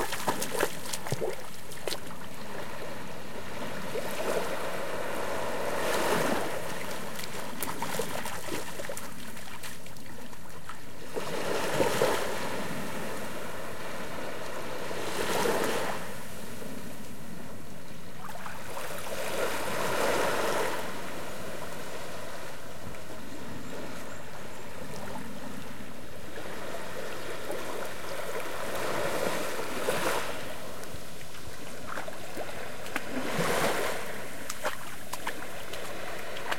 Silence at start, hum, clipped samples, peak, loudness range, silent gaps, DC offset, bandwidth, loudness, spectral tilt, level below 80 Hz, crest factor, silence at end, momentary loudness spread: 0 s; none; under 0.1%; -10 dBFS; 9 LU; none; 3%; 16.5 kHz; -34 LUFS; -3.5 dB/octave; -60 dBFS; 26 dB; 0 s; 14 LU